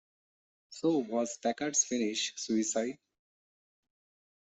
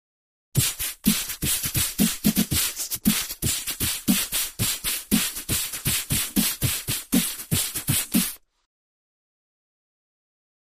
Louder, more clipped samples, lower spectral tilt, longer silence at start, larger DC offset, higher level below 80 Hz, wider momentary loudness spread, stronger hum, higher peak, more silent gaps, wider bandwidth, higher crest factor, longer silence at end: second, -32 LUFS vs -23 LUFS; neither; about the same, -2.5 dB/octave vs -2.5 dB/octave; first, 0.7 s vs 0.55 s; neither; second, -80 dBFS vs -44 dBFS; first, 8 LU vs 3 LU; neither; second, -14 dBFS vs -6 dBFS; neither; second, 8.4 kHz vs 15.5 kHz; about the same, 20 dB vs 20 dB; second, 1.5 s vs 2.25 s